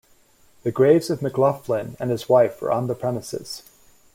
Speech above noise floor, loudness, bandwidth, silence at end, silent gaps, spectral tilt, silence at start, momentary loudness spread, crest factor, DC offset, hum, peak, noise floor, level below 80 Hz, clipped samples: 35 dB; -22 LUFS; 16.5 kHz; 0.55 s; none; -6.5 dB/octave; 0.65 s; 14 LU; 18 dB; under 0.1%; none; -4 dBFS; -56 dBFS; -60 dBFS; under 0.1%